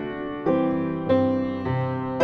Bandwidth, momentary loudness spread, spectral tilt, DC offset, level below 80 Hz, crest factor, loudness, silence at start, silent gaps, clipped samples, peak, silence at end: 6.2 kHz; 6 LU; -9 dB/octave; under 0.1%; -52 dBFS; 16 dB; -24 LUFS; 0 s; none; under 0.1%; -6 dBFS; 0 s